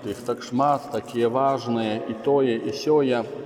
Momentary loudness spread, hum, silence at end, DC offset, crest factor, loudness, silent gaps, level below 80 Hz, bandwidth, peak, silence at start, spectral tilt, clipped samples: 6 LU; none; 0 s; under 0.1%; 16 dB; -23 LUFS; none; -66 dBFS; 15.5 kHz; -8 dBFS; 0 s; -6 dB/octave; under 0.1%